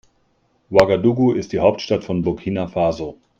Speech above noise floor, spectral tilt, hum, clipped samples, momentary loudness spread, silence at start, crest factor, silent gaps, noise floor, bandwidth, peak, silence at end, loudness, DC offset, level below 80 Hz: 45 dB; -7 dB/octave; none; under 0.1%; 8 LU; 0.7 s; 20 dB; none; -63 dBFS; 8 kHz; 0 dBFS; 0.25 s; -19 LUFS; under 0.1%; -48 dBFS